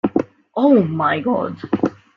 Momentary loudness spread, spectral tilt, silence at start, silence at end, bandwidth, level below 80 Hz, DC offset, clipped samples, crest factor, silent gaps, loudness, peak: 9 LU; -9 dB/octave; 0.05 s; 0.2 s; 6.4 kHz; -58 dBFS; under 0.1%; under 0.1%; 16 dB; none; -18 LUFS; -2 dBFS